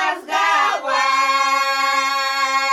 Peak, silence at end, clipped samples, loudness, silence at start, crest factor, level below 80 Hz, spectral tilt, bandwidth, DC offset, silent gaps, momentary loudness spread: -4 dBFS; 0 s; under 0.1%; -17 LUFS; 0 s; 14 dB; -68 dBFS; 1.5 dB/octave; 14.5 kHz; under 0.1%; none; 3 LU